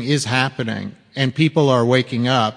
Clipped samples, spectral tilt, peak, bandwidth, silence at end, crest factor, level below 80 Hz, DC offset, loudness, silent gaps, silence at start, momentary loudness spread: under 0.1%; -5.5 dB/octave; 0 dBFS; 10.5 kHz; 0 s; 18 dB; -58 dBFS; under 0.1%; -18 LUFS; none; 0 s; 10 LU